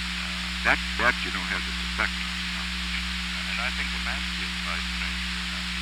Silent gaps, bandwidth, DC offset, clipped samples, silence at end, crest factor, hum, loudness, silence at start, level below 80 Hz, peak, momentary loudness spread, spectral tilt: none; 19 kHz; under 0.1%; under 0.1%; 0 s; 22 dB; 60 Hz at -40 dBFS; -27 LUFS; 0 s; -36 dBFS; -6 dBFS; 5 LU; -3 dB/octave